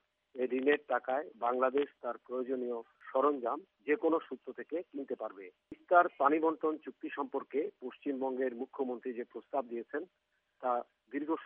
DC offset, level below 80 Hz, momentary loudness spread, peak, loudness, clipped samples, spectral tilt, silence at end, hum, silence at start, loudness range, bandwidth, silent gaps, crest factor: under 0.1%; -88 dBFS; 13 LU; -12 dBFS; -35 LUFS; under 0.1%; -2.5 dB/octave; 0 s; none; 0.35 s; 5 LU; 3.8 kHz; none; 22 dB